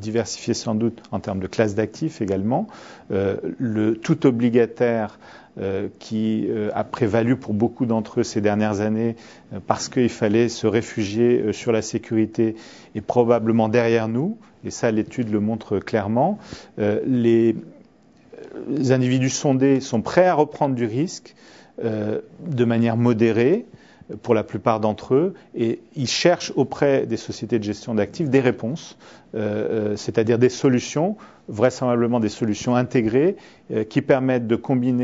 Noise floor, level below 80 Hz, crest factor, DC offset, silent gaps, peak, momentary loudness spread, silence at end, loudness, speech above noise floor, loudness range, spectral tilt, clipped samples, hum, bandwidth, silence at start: -53 dBFS; -58 dBFS; 20 dB; under 0.1%; none; -2 dBFS; 10 LU; 0 s; -21 LUFS; 32 dB; 3 LU; -6 dB/octave; under 0.1%; none; 8 kHz; 0 s